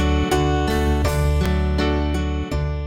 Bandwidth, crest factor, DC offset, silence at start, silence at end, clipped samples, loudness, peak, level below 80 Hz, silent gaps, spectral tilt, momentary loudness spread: 16 kHz; 12 dB; under 0.1%; 0 s; 0 s; under 0.1%; -21 LUFS; -6 dBFS; -22 dBFS; none; -6.5 dB/octave; 5 LU